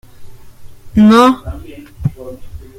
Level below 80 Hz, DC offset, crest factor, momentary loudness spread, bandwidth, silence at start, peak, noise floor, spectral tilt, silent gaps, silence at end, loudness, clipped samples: -34 dBFS; under 0.1%; 14 dB; 25 LU; 15 kHz; 0.2 s; 0 dBFS; -32 dBFS; -6.5 dB/octave; none; 0.2 s; -12 LUFS; under 0.1%